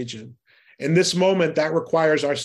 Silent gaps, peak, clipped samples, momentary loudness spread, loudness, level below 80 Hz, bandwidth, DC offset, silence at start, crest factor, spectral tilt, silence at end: none; -6 dBFS; under 0.1%; 12 LU; -20 LUFS; -66 dBFS; 12.5 kHz; under 0.1%; 0 s; 16 dB; -4.5 dB/octave; 0 s